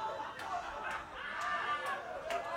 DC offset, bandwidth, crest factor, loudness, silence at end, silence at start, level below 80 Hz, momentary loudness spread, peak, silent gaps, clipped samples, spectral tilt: under 0.1%; 16.5 kHz; 14 dB; -39 LUFS; 0 s; 0 s; -66 dBFS; 6 LU; -26 dBFS; none; under 0.1%; -2.5 dB/octave